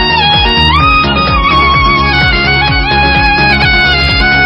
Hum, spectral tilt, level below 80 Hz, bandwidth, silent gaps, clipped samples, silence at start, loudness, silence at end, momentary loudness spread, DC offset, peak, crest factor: none; -6 dB/octave; -18 dBFS; 11 kHz; none; 0.2%; 0 s; -7 LUFS; 0 s; 2 LU; under 0.1%; 0 dBFS; 8 dB